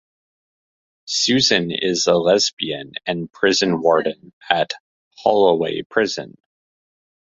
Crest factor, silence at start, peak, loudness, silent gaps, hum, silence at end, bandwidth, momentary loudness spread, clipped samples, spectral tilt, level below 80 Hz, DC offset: 18 dB; 1.05 s; -2 dBFS; -18 LUFS; 2.53-2.57 s, 4.33-4.41 s, 4.80-5.11 s, 5.86-5.90 s; none; 0.95 s; 8 kHz; 11 LU; under 0.1%; -3 dB/octave; -60 dBFS; under 0.1%